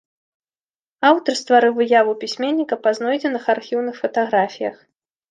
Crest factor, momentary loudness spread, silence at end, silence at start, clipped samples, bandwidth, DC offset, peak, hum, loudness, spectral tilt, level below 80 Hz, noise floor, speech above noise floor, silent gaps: 18 dB; 8 LU; 0.55 s; 1 s; under 0.1%; 9.6 kHz; under 0.1%; -2 dBFS; none; -19 LUFS; -4 dB/octave; -74 dBFS; under -90 dBFS; over 72 dB; none